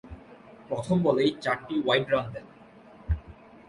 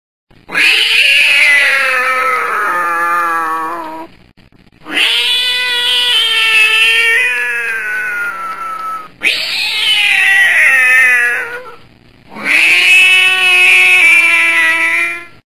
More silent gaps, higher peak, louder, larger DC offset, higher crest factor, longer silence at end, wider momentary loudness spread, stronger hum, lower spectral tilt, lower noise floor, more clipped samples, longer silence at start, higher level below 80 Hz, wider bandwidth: neither; second, -8 dBFS vs 0 dBFS; second, -27 LUFS vs -8 LUFS; second, under 0.1% vs 1%; first, 20 dB vs 12 dB; about the same, 0.35 s vs 0.3 s; first, 21 LU vs 14 LU; neither; first, -6.5 dB/octave vs 1 dB/octave; first, -52 dBFS vs -45 dBFS; neither; second, 0.05 s vs 0.5 s; first, -42 dBFS vs -56 dBFS; second, 11.5 kHz vs 15 kHz